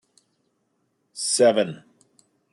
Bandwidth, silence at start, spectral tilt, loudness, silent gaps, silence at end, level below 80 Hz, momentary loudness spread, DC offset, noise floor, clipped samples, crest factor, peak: 12 kHz; 1.15 s; -3 dB/octave; -21 LUFS; none; 0.8 s; -80 dBFS; 24 LU; under 0.1%; -72 dBFS; under 0.1%; 20 dB; -6 dBFS